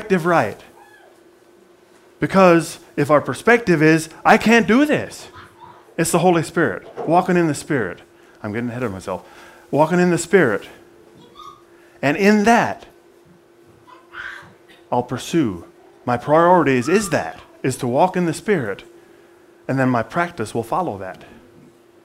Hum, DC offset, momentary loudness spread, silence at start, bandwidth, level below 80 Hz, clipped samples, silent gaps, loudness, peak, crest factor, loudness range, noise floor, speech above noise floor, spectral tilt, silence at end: none; under 0.1%; 19 LU; 0 s; 16 kHz; -54 dBFS; under 0.1%; none; -18 LUFS; 0 dBFS; 20 dB; 7 LU; -51 dBFS; 33 dB; -5.5 dB/octave; 0.8 s